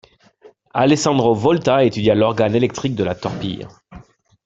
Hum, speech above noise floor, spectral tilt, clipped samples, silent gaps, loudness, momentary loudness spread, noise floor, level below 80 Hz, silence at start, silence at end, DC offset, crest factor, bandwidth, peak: none; 33 dB; -6 dB/octave; under 0.1%; none; -17 LUFS; 11 LU; -49 dBFS; -50 dBFS; 0.75 s; 0.45 s; under 0.1%; 18 dB; 8.2 kHz; -2 dBFS